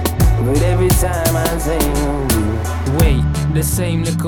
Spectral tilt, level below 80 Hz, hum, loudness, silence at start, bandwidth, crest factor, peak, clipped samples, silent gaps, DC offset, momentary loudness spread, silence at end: -5.5 dB/octave; -20 dBFS; none; -16 LUFS; 0 s; over 20 kHz; 14 dB; -2 dBFS; under 0.1%; none; under 0.1%; 4 LU; 0 s